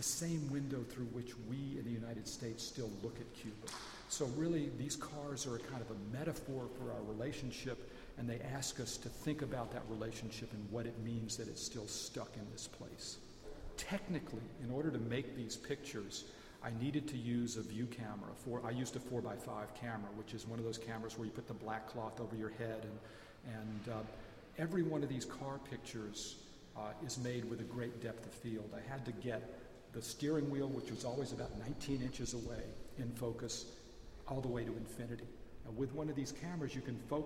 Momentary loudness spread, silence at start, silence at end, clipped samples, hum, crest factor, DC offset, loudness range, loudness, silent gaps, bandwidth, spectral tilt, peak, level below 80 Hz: 9 LU; 0 s; 0 s; under 0.1%; none; 18 dB; under 0.1%; 3 LU; -44 LUFS; none; 16 kHz; -5 dB/octave; -26 dBFS; -60 dBFS